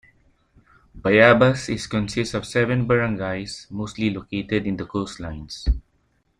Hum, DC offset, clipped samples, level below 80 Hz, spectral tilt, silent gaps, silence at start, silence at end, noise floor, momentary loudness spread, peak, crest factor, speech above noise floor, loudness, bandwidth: none; under 0.1%; under 0.1%; -36 dBFS; -6 dB/octave; none; 0.95 s; 0.6 s; -66 dBFS; 16 LU; -2 dBFS; 20 dB; 45 dB; -22 LUFS; 11 kHz